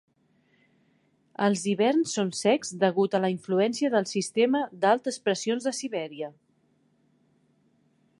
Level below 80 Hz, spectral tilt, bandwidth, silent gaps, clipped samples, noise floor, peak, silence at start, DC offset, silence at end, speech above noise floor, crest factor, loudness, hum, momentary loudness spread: -78 dBFS; -4.5 dB/octave; 11.5 kHz; none; under 0.1%; -67 dBFS; -8 dBFS; 1.4 s; under 0.1%; 1.9 s; 42 dB; 18 dB; -26 LUFS; none; 9 LU